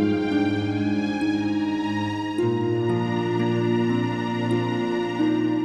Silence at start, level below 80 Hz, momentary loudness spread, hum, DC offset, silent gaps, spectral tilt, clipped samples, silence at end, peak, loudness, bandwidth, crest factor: 0 s; -58 dBFS; 3 LU; none; under 0.1%; none; -7.5 dB/octave; under 0.1%; 0 s; -10 dBFS; -24 LUFS; 10 kHz; 12 dB